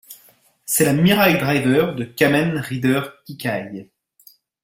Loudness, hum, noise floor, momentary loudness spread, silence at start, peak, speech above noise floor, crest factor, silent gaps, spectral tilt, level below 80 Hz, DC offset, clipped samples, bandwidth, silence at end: -18 LUFS; none; -55 dBFS; 16 LU; 0.1 s; -2 dBFS; 36 dB; 18 dB; none; -5 dB/octave; -54 dBFS; under 0.1%; under 0.1%; 16.5 kHz; 0.8 s